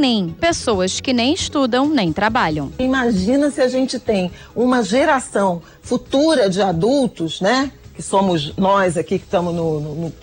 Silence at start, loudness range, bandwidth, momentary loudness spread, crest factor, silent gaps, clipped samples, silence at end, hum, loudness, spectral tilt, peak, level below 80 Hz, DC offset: 0 s; 1 LU; 16.5 kHz; 6 LU; 12 dB; none; under 0.1%; 0 s; none; -18 LUFS; -5 dB/octave; -6 dBFS; -44 dBFS; under 0.1%